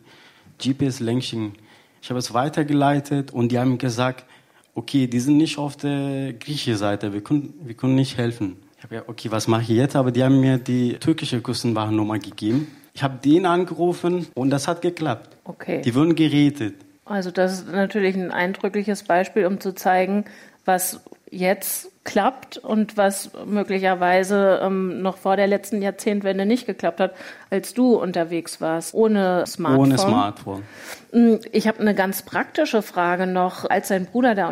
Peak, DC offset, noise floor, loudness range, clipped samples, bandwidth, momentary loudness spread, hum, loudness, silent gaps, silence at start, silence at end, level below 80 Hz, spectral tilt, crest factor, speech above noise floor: -6 dBFS; under 0.1%; -50 dBFS; 3 LU; under 0.1%; 16 kHz; 11 LU; none; -21 LUFS; none; 0.6 s; 0 s; -64 dBFS; -6 dB/octave; 14 dB; 29 dB